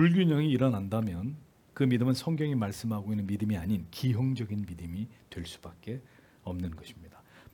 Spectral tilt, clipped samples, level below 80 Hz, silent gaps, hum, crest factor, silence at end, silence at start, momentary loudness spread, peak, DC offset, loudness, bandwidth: -7.5 dB/octave; under 0.1%; -60 dBFS; none; none; 18 dB; 0.45 s; 0 s; 17 LU; -14 dBFS; under 0.1%; -31 LUFS; 18 kHz